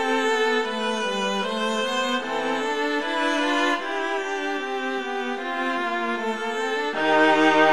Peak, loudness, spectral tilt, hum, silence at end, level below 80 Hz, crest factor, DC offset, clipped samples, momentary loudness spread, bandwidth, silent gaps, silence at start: -6 dBFS; -23 LUFS; -3 dB/octave; none; 0 s; -68 dBFS; 18 dB; 0.5%; under 0.1%; 8 LU; 13 kHz; none; 0 s